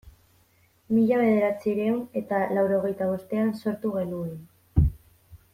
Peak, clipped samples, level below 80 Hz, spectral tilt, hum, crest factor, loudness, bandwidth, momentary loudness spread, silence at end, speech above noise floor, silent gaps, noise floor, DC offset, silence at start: -8 dBFS; under 0.1%; -40 dBFS; -9 dB/octave; none; 18 dB; -26 LUFS; 15 kHz; 8 LU; 0.15 s; 38 dB; none; -63 dBFS; under 0.1%; 0.05 s